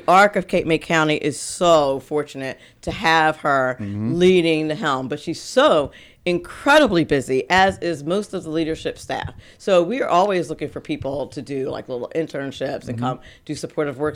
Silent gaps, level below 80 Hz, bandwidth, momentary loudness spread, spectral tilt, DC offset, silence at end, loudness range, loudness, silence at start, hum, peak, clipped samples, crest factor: none; -48 dBFS; 16 kHz; 13 LU; -5 dB/octave; under 0.1%; 0 s; 5 LU; -20 LUFS; 0.1 s; none; -4 dBFS; under 0.1%; 16 dB